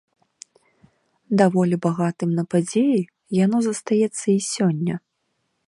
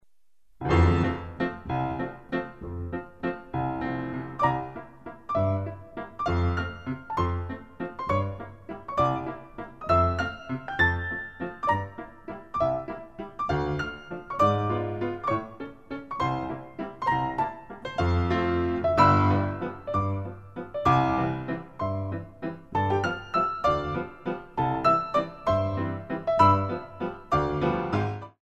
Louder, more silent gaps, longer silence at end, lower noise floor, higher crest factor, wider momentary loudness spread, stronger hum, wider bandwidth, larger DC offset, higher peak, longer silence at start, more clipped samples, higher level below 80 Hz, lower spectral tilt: first, -21 LUFS vs -27 LUFS; neither; first, 0.7 s vs 0.15 s; about the same, -73 dBFS vs -73 dBFS; about the same, 18 dB vs 22 dB; second, 6 LU vs 15 LU; neither; first, 11.5 kHz vs 8 kHz; second, under 0.1% vs 0.2%; about the same, -4 dBFS vs -6 dBFS; first, 1.3 s vs 0.6 s; neither; second, -68 dBFS vs -44 dBFS; about the same, -6.5 dB/octave vs -7.5 dB/octave